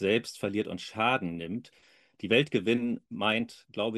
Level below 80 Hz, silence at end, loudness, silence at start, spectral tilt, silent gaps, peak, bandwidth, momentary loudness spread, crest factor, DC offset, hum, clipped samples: -68 dBFS; 0 s; -30 LUFS; 0 s; -5.5 dB/octave; none; -10 dBFS; 12.5 kHz; 12 LU; 20 dB; under 0.1%; none; under 0.1%